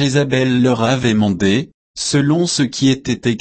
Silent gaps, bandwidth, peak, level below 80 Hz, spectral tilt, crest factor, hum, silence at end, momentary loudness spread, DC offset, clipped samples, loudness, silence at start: 1.74-1.94 s; 8.8 kHz; -2 dBFS; -48 dBFS; -5 dB/octave; 12 dB; none; 0 s; 5 LU; 0.2%; under 0.1%; -16 LUFS; 0 s